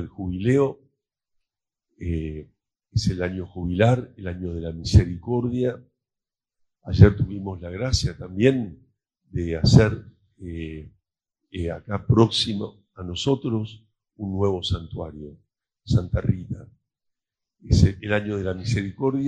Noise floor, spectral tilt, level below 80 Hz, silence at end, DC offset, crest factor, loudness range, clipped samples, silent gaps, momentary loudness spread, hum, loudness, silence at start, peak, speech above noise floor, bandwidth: -88 dBFS; -6.5 dB/octave; -36 dBFS; 0 s; under 0.1%; 24 dB; 5 LU; under 0.1%; none; 18 LU; none; -23 LUFS; 0 s; 0 dBFS; 66 dB; 9.4 kHz